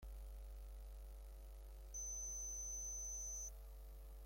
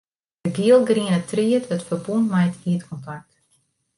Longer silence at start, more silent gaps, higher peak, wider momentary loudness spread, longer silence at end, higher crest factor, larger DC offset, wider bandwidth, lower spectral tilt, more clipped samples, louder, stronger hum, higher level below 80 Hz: second, 0 s vs 0.45 s; neither; second, -40 dBFS vs -6 dBFS; second, 14 LU vs 18 LU; second, 0 s vs 0.8 s; second, 10 dB vs 16 dB; neither; first, 16.5 kHz vs 11.5 kHz; second, -2.5 dB/octave vs -7 dB/octave; neither; second, -49 LUFS vs -21 LUFS; neither; first, -54 dBFS vs -64 dBFS